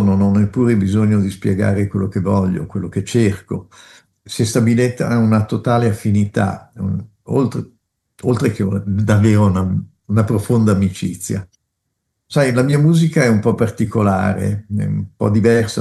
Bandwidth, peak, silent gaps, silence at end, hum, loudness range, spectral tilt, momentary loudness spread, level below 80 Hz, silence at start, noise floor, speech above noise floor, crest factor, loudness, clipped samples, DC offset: 12.5 kHz; -2 dBFS; none; 0 s; none; 3 LU; -7 dB/octave; 10 LU; -52 dBFS; 0 s; -73 dBFS; 58 dB; 14 dB; -17 LUFS; under 0.1%; under 0.1%